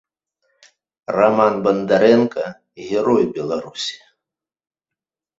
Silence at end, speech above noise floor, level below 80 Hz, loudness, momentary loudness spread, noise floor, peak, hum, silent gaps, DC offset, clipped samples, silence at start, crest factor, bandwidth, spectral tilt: 1.45 s; 70 dB; -60 dBFS; -18 LUFS; 14 LU; -87 dBFS; -2 dBFS; none; none; under 0.1%; under 0.1%; 1.1 s; 18 dB; 8 kHz; -5.5 dB/octave